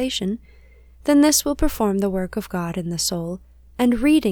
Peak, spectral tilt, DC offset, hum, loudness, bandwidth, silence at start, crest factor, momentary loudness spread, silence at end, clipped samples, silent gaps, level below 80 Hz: -4 dBFS; -4 dB/octave; under 0.1%; none; -21 LUFS; 20 kHz; 0 s; 16 dB; 14 LU; 0 s; under 0.1%; none; -36 dBFS